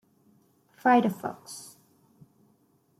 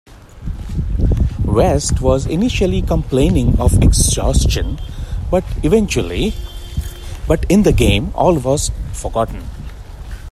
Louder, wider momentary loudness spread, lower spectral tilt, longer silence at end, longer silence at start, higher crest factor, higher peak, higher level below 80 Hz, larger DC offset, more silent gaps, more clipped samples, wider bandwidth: second, -26 LUFS vs -16 LUFS; first, 21 LU vs 17 LU; about the same, -5.5 dB/octave vs -5.5 dB/octave; first, 1.35 s vs 0 s; first, 0.85 s vs 0.1 s; first, 22 dB vs 14 dB; second, -10 dBFS vs 0 dBFS; second, -78 dBFS vs -20 dBFS; neither; neither; neither; about the same, 15.5 kHz vs 15 kHz